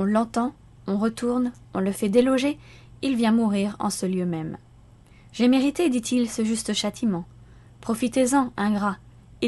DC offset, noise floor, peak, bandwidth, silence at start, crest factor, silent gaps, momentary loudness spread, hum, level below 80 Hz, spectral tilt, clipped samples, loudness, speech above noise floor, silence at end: under 0.1%; -51 dBFS; -6 dBFS; 12.5 kHz; 0 s; 18 dB; none; 11 LU; none; -54 dBFS; -5 dB/octave; under 0.1%; -24 LUFS; 28 dB; 0 s